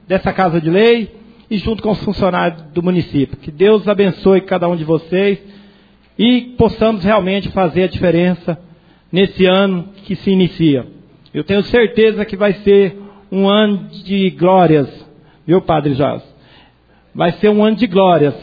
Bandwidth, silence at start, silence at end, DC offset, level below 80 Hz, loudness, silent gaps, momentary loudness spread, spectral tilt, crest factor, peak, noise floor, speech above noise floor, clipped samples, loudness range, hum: 5 kHz; 0.1 s; 0 s; under 0.1%; -40 dBFS; -14 LUFS; none; 10 LU; -9.5 dB/octave; 14 dB; 0 dBFS; -50 dBFS; 37 dB; under 0.1%; 2 LU; none